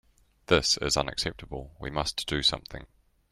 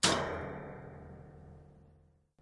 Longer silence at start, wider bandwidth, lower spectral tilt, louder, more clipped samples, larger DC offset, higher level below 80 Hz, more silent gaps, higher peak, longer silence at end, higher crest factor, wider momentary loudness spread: first, 0.5 s vs 0 s; first, 15.5 kHz vs 11.5 kHz; about the same, -3 dB/octave vs -2.5 dB/octave; first, -27 LUFS vs -37 LUFS; neither; neither; first, -46 dBFS vs -60 dBFS; neither; first, -8 dBFS vs -12 dBFS; about the same, 0.45 s vs 0.5 s; about the same, 24 dB vs 26 dB; second, 17 LU vs 23 LU